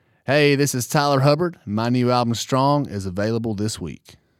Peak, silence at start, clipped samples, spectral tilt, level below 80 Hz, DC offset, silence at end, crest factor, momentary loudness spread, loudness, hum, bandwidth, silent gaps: -2 dBFS; 0.3 s; under 0.1%; -5.5 dB/octave; -56 dBFS; under 0.1%; 0.3 s; 18 dB; 9 LU; -20 LUFS; none; 16 kHz; none